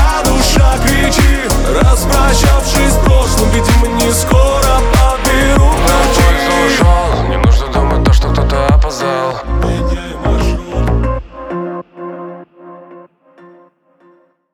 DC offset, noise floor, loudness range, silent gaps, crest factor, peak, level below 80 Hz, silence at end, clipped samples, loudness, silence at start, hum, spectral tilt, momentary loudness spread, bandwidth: under 0.1%; -49 dBFS; 10 LU; none; 10 dB; 0 dBFS; -14 dBFS; 1.55 s; under 0.1%; -12 LUFS; 0 s; none; -5 dB/octave; 9 LU; over 20 kHz